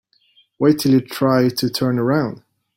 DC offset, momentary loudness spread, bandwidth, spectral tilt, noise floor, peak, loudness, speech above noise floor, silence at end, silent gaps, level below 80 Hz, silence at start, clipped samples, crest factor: under 0.1%; 4 LU; 16.5 kHz; -6.5 dB/octave; -58 dBFS; -2 dBFS; -18 LUFS; 41 dB; 0.4 s; none; -58 dBFS; 0.6 s; under 0.1%; 16 dB